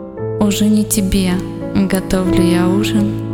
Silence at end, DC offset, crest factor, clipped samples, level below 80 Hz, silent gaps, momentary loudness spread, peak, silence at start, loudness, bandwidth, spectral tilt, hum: 0 s; under 0.1%; 14 dB; under 0.1%; -32 dBFS; none; 5 LU; 0 dBFS; 0 s; -15 LUFS; 18 kHz; -5.5 dB/octave; none